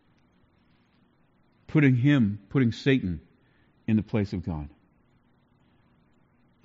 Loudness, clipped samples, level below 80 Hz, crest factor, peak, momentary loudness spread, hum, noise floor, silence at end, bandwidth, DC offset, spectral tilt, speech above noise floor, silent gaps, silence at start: -26 LUFS; under 0.1%; -54 dBFS; 18 dB; -10 dBFS; 16 LU; none; -64 dBFS; 1.95 s; 7.6 kHz; under 0.1%; -7 dB/octave; 40 dB; none; 1.7 s